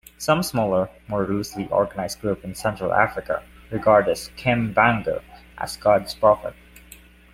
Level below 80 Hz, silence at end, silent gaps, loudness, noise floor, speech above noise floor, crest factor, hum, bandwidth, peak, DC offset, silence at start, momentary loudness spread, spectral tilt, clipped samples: -48 dBFS; 0.55 s; none; -22 LUFS; -48 dBFS; 26 dB; 22 dB; none; 16 kHz; -2 dBFS; under 0.1%; 0.2 s; 11 LU; -5.5 dB/octave; under 0.1%